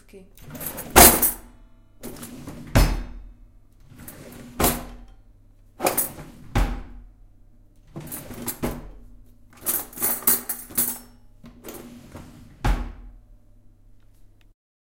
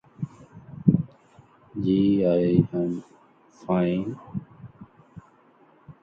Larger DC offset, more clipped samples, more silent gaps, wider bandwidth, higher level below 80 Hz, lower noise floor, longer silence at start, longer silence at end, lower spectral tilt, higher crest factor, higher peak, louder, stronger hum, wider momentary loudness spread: neither; neither; neither; first, 17 kHz vs 6.8 kHz; first, -34 dBFS vs -54 dBFS; second, -52 dBFS vs -57 dBFS; about the same, 0.15 s vs 0.2 s; first, 1.75 s vs 0.1 s; second, -3 dB/octave vs -10 dB/octave; about the same, 26 dB vs 24 dB; first, 0 dBFS vs -4 dBFS; first, -21 LUFS vs -24 LUFS; neither; first, 24 LU vs 20 LU